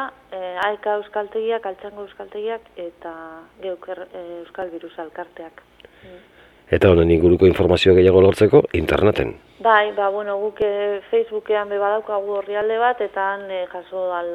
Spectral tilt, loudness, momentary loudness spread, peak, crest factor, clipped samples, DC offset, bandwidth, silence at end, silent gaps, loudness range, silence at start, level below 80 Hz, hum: -7 dB/octave; -19 LUFS; 20 LU; 0 dBFS; 18 dB; under 0.1%; under 0.1%; 12.5 kHz; 0 s; none; 18 LU; 0 s; -42 dBFS; 50 Hz at -50 dBFS